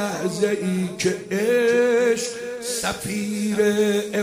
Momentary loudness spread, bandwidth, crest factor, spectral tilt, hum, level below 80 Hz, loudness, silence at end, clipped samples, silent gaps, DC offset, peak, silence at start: 8 LU; 16 kHz; 14 dB; -4.5 dB/octave; none; -58 dBFS; -22 LUFS; 0 s; under 0.1%; none; under 0.1%; -8 dBFS; 0 s